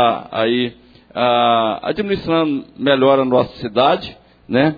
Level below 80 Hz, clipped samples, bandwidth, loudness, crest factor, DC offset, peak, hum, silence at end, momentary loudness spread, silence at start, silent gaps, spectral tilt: -50 dBFS; under 0.1%; 5 kHz; -17 LUFS; 16 dB; under 0.1%; 0 dBFS; none; 0 s; 8 LU; 0 s; none; -8 dB/octave